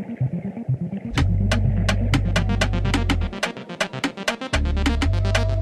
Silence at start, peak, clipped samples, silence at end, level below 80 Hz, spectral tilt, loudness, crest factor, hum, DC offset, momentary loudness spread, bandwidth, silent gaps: 0 s; -6 dBFS; under 0.1%; 0 s; -26 dBFS; -5.5 dB/octave; -23 LUFS; 16 dB; none; under 0.1%; 6 LU; 13 kHz; none